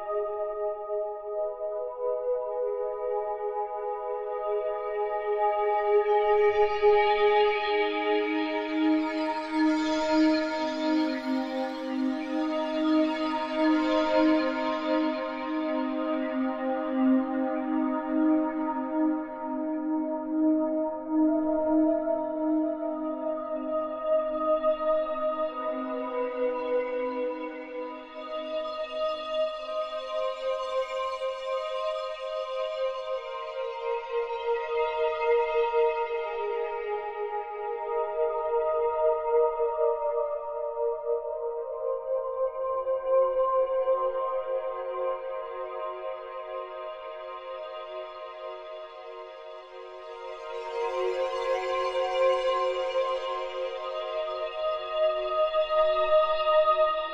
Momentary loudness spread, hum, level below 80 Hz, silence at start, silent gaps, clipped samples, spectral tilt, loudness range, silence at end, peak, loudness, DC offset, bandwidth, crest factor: 11 LU; none; -60 dBFS; 0 s; none; under 0.1%; -4.5 dB/octave; 7 LU; 0 s; -12 dBFS; -28 LUFS; under 0.1%; 7.6 kHz; 16 dB